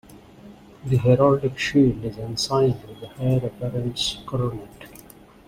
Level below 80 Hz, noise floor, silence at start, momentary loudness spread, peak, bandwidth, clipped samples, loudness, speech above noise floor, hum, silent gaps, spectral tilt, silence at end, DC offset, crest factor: -48 dBFS; -47 dBFS; 0.1 s; 20 LU; -4 dBFS; 15.5 kHz; under 0.1%; -22 LUFS; 25 dB; none; none; -6 dB/octave; 0.45 s; under 0.1%; 18 dB